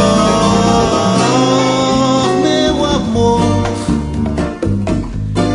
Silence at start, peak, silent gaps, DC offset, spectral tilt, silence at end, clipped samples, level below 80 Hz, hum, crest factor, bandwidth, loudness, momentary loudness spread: 0 s; 0 dBFS; none; under 0.1%; -5.5 dB/octave; 0 s; under 0.1%; -28 dBFS; none; 12 dB; 11 kHz; -13 LUFS; 7 LU